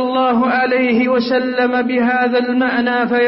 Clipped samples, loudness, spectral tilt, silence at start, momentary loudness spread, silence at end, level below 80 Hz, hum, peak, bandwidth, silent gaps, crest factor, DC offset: under 0.1%; -15 LUFS; -9 dB/octave; 0 s; 2 LU; 0 s; -56 dBFS; none; -6 dBFS; 5.8 kHz; none; 10 dB; under 0.1%